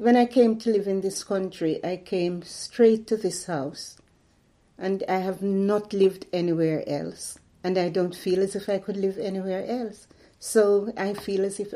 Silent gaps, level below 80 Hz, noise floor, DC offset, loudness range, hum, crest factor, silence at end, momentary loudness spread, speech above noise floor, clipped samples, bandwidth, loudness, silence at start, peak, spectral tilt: none; -64 dBFS; -62 dBFS; under 0.1%; 3 LU; none; 18 dB; 0 s; 13 LU; 38 dB; under 0.1%; 15 kHz; -25 LUFS; 0 s; -8 dBFS; -5.5 dB/octave